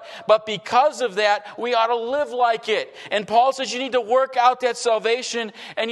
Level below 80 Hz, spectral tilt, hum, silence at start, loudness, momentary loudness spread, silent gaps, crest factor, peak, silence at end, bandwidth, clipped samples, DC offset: -72 dBFS; -2 dB/octave; none; 0 s; -21 LUFS; 7 LU; none; 16 dB; -4 dBFS; 0 s; 12 kHz; under 0.1%; under 0.1%